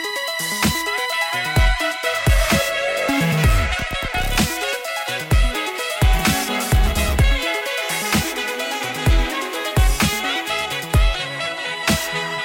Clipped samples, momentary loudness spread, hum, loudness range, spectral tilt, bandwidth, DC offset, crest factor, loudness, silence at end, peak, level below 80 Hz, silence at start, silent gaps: under 0.1%; 5 LU; none; 2 LU; -4 dB/octave; 17 kHz; under 0.1%; 12 dB; -20 LUFS; 0 s; -6 dBFS; -24 dBFS; 0 s; none